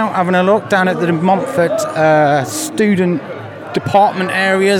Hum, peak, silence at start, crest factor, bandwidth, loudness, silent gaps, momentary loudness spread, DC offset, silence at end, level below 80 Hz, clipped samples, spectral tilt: none; -2 dBFS; 0 s; 12 dB; 17 kHz; -14 LUFS; none; 9 LU; under 0.1%; 0 s; -58 dBFS; under 0.1%; -5.5 dB/octave